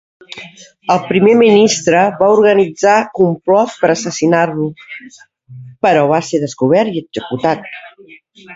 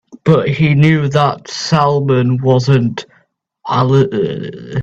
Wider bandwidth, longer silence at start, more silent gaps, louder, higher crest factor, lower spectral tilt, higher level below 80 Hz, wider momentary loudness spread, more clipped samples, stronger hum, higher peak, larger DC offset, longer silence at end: about the same, 8 kHz vs 7.8 kHz; first, 0.3 s vs 0.15 s; neither; about the same, -13 LUFS vs -13 LUFS; about the same, 14 dB vs 14 dB; second, -5 dB/octave vs -7 dB/octave; second, -56 dBFS vs -48 dBFS; first, 22 LU vs 10 LU; neither; neither; about the same, 0 dBFS vs 0 dBFS; neither; about the same, 0 s vs 0 s